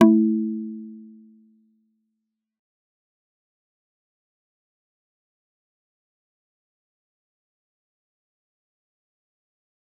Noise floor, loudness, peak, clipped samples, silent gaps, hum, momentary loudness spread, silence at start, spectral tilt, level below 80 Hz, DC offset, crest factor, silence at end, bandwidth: -81 dBFS; -22 LUFS; -2 dBFS; under 0.1%; none; none; 24 LU; 0 s; -6 dB/octave; -82 dBFS; under 0.1%; 28 dB; 8.95 s; 3.5 kHz